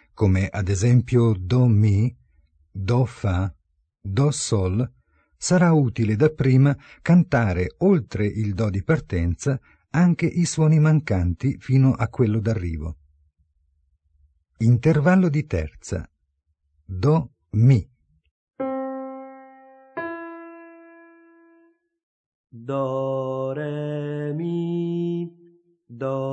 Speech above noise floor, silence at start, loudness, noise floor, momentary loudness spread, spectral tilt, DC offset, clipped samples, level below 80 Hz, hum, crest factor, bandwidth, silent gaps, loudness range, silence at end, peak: 52 dB; 0.2 s; -22 LUFS; -72 dBFS; 14 LU; -7.5 dB/octave; under 0.1%; under 0.1%; -44 dBFS; none; 16 dB; 9 kHz; 18.31-18.47 s, 22.03-22.44 s; 12 LU; 0 s; -6 dBFS